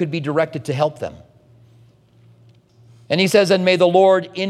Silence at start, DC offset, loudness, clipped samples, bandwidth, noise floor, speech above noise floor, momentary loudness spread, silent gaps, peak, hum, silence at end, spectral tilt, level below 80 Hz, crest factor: 0 s; under 0.1%; -16 LUFS; under 0.1%; 14 kHz; -51 dBFS; 35 dB; 10 LU; none; 0 dBFS; none; 0 s; -5.5 dB/octave; -62 dBFS; 18 dB